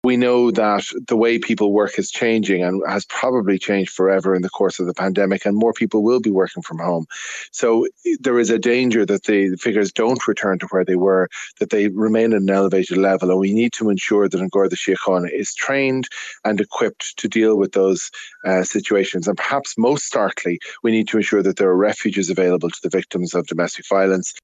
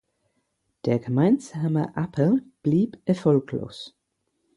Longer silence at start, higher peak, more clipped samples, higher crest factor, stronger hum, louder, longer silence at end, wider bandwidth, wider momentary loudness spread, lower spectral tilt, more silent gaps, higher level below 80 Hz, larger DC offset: second, 0.05 s vs 0.85 s; first, -4 dBFS vs -8 dBFS; neither; about the same, 14 dB vs 16 dB; neither; first, -18 LUFS vs -24 LUFS; second, 0.05 s vs 0.7 s; second, 9.2 kHz vs 11.5 kHz; second, 6 LU vs 11 LU; second, -5 dB/octave vs -8.5 dB/octave; neither; about the same, -64 dBFS vs -62 dBFS; neither